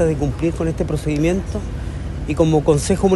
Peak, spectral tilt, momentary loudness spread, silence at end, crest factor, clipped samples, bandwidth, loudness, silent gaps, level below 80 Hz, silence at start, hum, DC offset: -2 dBFS; -6.5 dB/octave; 11 LU; 0 s; 16 dB; under 0.1%; 12.5 kHz; -20 LUFS; none; -28 dBFS; 0 s; none; under 0.1%